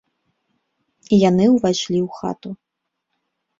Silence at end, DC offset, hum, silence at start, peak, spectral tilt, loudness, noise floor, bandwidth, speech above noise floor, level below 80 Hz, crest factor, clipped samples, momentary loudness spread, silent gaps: 1.05 s; under 0.1%; none; 1.1 s; -2 dBFS; -6 dB/octave; -18 LUFS; -78 dBFS; 7.6 kHz; 61 dB; -56 dBFS; 18 dB; under 0.1%; 19 LU; none